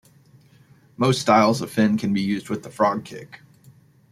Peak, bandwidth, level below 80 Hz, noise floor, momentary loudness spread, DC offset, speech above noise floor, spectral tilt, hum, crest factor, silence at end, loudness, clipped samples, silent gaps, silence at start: -2 dBFS; 14.5 kHz; -62 dBFS; -54 dBFS; 14 LU; under 0.1%; 33 dB; -5.5 dB/octave; none; 20 dB; 0.75 s; -21 LUFS; under 0.1%; none; 1 s